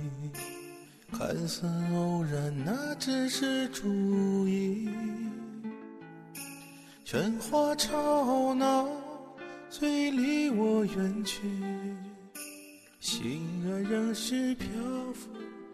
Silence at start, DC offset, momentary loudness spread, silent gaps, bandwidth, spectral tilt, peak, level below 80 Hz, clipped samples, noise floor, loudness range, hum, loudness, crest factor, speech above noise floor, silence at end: 0 s; under 0.1%; 17 LU; none; 14 kHz; -5 dB/octave; -14 dBFS; -62 dBFS; under 0.1%; -52 dBFS; 5 LU; none; -31 LUFS; 18 dB; 21 dB; 0 s